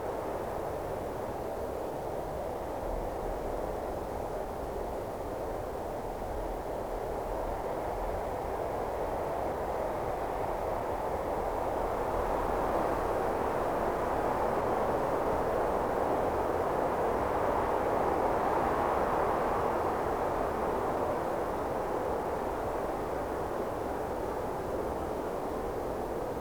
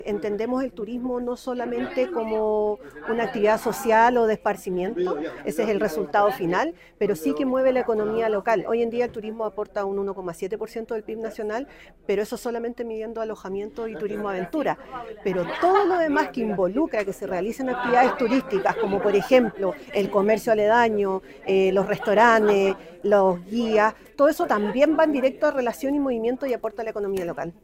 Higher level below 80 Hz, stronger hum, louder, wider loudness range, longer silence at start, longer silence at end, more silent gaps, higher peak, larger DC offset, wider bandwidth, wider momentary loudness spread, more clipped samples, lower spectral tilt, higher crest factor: first, -46 dBFS vs -54 dBFS; neither; second, -33 LUFS vs -23 LUFS; about the same, 7 LU vs 9 LU; about the same, 0 s vs 0 s; about the same, 0 s vs 0.1 s; neither; second, -16 dBFS vs -4 dBFS; first, 0.2% vs under 0.1%; first, over 20 kHz vs 16 kHz; second, 7 LU vs 11 LU; neither; about the same, -6.5 dB/octave vs -5.5 dB/octave; about the same, 16 dB vs 18 dB